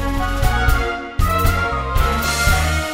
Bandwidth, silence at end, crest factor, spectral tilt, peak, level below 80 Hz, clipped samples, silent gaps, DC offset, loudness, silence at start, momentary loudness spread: 16.5 kHz; 0 s; 14 dB; -4.5 dB/octave; -4 dBFS; -20 dBFS; under 0.1%; none; under 0.1%; -18 LUFS; 0 s; 5 LU